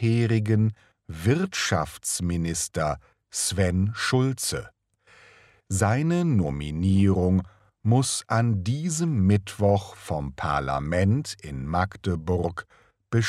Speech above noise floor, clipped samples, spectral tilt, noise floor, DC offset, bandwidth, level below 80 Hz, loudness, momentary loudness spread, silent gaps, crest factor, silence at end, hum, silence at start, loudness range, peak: 33 dB; under 0.1%; -5.5 dB/octave; -57 dBFS; under 0.1%; 14 kHz; -46 dBFS; -25 LUFS; 9 LU; none; 18 dB; 0 s; none; 0 s; 3 LU; -6 dBFS